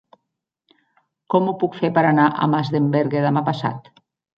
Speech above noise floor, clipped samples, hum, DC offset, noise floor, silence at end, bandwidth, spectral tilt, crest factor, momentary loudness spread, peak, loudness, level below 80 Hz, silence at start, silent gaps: 61 dB; under 0.1%; none; under 0.1%; -79 dBFS; 0.6 s; 6.6 kHz; -9 dB/octave; 18 dB; 8 LU; -2 dBFS; -19 LUFS; -64 dBFS; 1.3 s; none